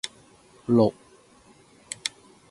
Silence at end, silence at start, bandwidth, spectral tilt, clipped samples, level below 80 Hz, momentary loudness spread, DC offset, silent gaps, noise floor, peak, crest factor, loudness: 0.4 s; 0.05 s; 11.5 kHz; -5.5 dB/octave; under 0.1%; -64 dBFS; 18 LU; under 0.1%; none; -56 dBFS; -6 dBFS; 22 dB; -25 LUFS